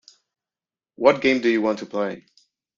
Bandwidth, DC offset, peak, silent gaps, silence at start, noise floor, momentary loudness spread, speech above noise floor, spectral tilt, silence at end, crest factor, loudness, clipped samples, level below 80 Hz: 7.4 kHz; under 0.1%; -2 dBFS; none; 1 s; under -90 dBFS; 11 LU; over 70 dB; -5.5 dB/octave; 0.6 s; 22 dB; -21 LUFS; under 0.1%; -66 dBFS